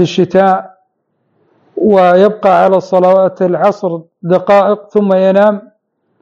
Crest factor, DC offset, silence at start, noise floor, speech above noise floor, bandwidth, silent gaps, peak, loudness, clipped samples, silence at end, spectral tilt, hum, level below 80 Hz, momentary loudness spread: 10 dB; under 0.1%; 0 s; -63 dBFS; 54 dB; 7.4 kHz; none; 0 dBFS; -10 LUFS; 0.4%; 0.6 s; -7.5 dB/octave; none; -58 dBFS; 9 LU